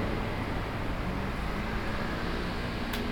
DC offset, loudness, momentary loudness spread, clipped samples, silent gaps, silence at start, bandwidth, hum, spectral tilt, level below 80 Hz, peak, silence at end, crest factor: under 0.1%; -33 LUFS; 1 LU; under 0.1%; none; 0 s; 19 kHz; none; -6 dB/octave; -38 dBFS; -18 dBFS; 0 s; 14 dB